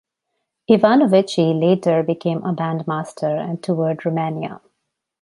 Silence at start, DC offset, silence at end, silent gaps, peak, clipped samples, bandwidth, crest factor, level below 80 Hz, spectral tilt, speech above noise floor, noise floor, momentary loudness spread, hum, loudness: 0.7 s; under 0.1%; 0.65 s; none; 0 dBFS; under 0.1%; 11.5 kHz; 18 dB; -64 dBFS; -7.5 dB/octave; 59 dB; -76 dBFS; 10 LU; none; -19 LUFS